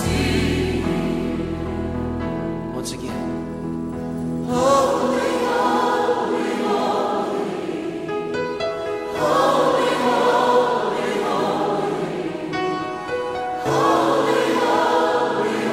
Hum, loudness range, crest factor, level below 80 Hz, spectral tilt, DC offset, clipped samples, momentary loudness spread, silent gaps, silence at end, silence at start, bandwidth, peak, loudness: none; 5 LU; 16 dB; -42 dBFS; -5.5 dB/octave; under 0.1%; under 0.1%; 10 LU; none; 0 s; 0 s; 16 kHz; -4 dBFS; -21 LUFS